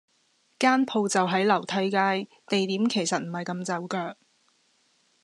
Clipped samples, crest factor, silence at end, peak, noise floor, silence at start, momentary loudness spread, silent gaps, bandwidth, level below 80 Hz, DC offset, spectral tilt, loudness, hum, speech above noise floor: under 0.1%; 20 dB; 1.1 s; -6 dBFS; -68 dBFS; 0.6 s; 9 LU; none; 12 kHz; -84 dBFS; under 0.1%; -4 dB/octave; -26 LUFS; none; 42 dB